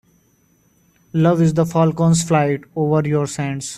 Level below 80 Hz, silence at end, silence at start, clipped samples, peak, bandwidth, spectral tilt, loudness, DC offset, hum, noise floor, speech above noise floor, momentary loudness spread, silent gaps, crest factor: -52 dBFS; 0 s; 1.15 s; under 0.1%; -2 dBFS; 13 kHz; -6.5 dB/octave; -17 LUFS; under 0.1%; none; -58 dBFS; 42 dB; 7 LU; none; 16 dB